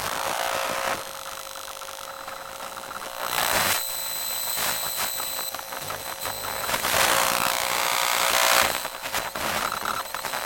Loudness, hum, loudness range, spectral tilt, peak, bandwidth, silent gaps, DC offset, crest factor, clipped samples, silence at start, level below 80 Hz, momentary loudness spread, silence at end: -24 LUFS; none; 6 LU; 0 dB/octave; -4 dBFS; 17.5 kHz; none; under 0.1%; 22 dB; under 0.1%; 0 s; -56 dBFS; 15 LU; 0 s